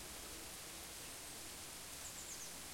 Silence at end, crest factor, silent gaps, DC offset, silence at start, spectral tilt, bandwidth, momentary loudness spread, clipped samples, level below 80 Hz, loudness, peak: 0 s; 14 dB; none; under 0.1%; 0 s; -1 dB/octave; 16.5 kHz; 2 LU; under 0.1%; -66 dBFS; -48 LUFS; -36 dBFS